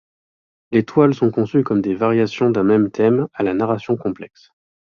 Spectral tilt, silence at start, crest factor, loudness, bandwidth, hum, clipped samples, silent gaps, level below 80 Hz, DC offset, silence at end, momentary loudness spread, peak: -8.5 dB/octave; 0.7 s; 16 dB; -18 LUFS; 7 kHz; none; under 0.1%; none; -56 dBFS; under 0.1%; 0.6 s; 6 LU; -2 dBFS